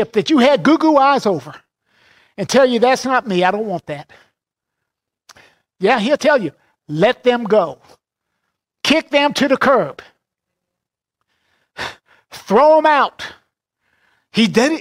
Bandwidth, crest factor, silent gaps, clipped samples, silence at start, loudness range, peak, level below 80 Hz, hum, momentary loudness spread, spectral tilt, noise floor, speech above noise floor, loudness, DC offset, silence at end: 16 kHz; 16 dB; none; under 0.1%; 0 s; 5 LU; -2 dBFS; -58 dBFS; none; 16 LU; -4.5 dB/octave; -83 dBFS; 68 dB; -15 LUFS; under 0.1%; 0 s